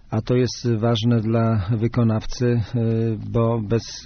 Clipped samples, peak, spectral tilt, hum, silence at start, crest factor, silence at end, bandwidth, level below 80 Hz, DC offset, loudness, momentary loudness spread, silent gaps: under 0.1%; -8 dBFS; -7.5 dB/octave; none; 0.1 s; 12 dB; 0 s; 6.6 kHz; -40 dBFS; under 0.1%; -21 LUFS; 3 LU; none